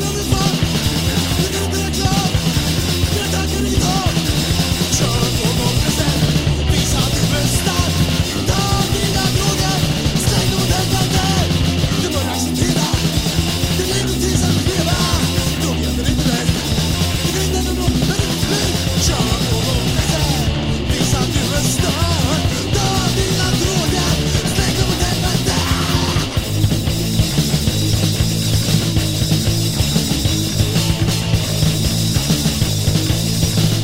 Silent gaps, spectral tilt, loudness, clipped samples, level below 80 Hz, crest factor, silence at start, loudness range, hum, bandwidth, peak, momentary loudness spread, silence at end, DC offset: none; -4.5 dB/octave; -16 LUFS; under 0.1%; -26 dBFS; 14 dB; 0 s; 1 LU; none; 16.5 kHz; -2 dBFS; 2 LU; 0 s; under 0.1%